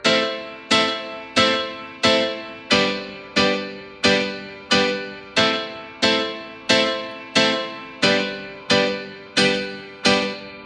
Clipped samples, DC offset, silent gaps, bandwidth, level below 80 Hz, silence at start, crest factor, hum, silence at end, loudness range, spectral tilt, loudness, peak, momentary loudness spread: under 0.1%; under 0.1%; none; 11.5 kHz; -58 dBFS; 0 s; 20 dB; none; 0 s; 1 LU; -3 dB/octave; -20 LUFS; -2 dBFS; 12 LU